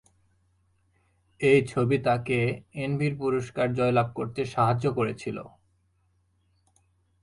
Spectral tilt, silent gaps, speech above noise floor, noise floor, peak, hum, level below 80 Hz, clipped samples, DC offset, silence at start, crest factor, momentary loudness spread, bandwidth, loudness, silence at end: -7 dB/octave; none; 43 dB; -69 dBFS; -8 dBFS; none; -58 dBFS; under 0.1%; under 0.1%; 1.4 s; 20 dB; 9 LU; 11.5 kHz; -26 LUFS; 1.75 s